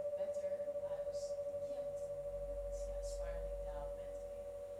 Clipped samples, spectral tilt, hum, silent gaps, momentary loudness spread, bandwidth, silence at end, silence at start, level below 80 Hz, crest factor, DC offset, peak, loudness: under 0.1%; -5 dB/octave; none; none; 6 LU; 13.5 kHz; 0 s; 0 s; -52 dBFS; 10 dB; under 0.1%; -32 dBFS; -44 LUFS